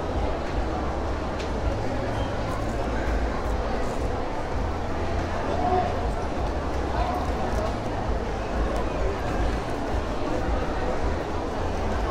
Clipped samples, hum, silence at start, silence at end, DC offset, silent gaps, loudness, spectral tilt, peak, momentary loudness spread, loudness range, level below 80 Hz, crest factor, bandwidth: under 0.1%; none; 0 s; 0 s; under 0.1%; none; -28 LUFS; -6.5 dB/octave; -10 dBFS; 3 LU; 1 LU; -30 dBFS; 14 dB; 12 kHz